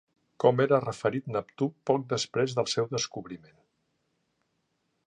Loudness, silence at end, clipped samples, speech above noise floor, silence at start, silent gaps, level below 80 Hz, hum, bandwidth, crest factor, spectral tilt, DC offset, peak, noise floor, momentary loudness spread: -28 LUFS; 1.7 s; under 0.1%; 49 dB; 0.4 s; none; -70 dBFS; none; 10.5 kHz; 22 dB; -5 dB/octave; under 0.1%; -8 dBFS; -77 dBFS; 10 LU